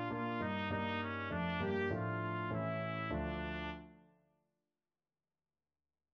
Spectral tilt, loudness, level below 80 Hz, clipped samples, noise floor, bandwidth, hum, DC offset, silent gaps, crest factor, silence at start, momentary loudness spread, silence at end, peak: -5 dB/octave; -39 LUFS; -58 dBFS; under 0.1%; under -90 dBFS; 6.6 kHz; none; under 0.1%; none; 16 dB; 0 s; 4 LU; 2.15 s; -26 dBFS